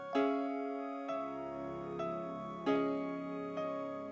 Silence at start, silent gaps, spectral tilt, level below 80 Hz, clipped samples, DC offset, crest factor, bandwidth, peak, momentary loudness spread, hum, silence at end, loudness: 0 s; none; -7 dB/octave; -72 dBFS; under 0.1%; under 0.1%; 18 dB; 7.6 kHz; -20 dBFS; 8 LU; none; 0 s; -38 LUFS